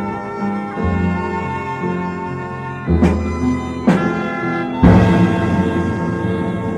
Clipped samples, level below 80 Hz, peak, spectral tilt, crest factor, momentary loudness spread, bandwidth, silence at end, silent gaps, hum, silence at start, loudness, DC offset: under 0.1%; -30 dBFS; 0 dBFS; -8 dB/octave; 16 dB; 11 LU; 9.6 kHz; 0 s; none; none; 0 s; -17 LUFS; under 0.1%